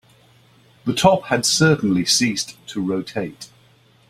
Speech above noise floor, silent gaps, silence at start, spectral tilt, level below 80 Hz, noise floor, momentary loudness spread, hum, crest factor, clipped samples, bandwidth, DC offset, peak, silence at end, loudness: 35 dB; none; 0.85 s; -4 dB/octave; -52 dBFS; -54 dBFS; 13 LU; none; 20 dB; under 0.1%; 16 kHz; under 0.1%; -2 dBFS; 0.65 s; -19 LUFS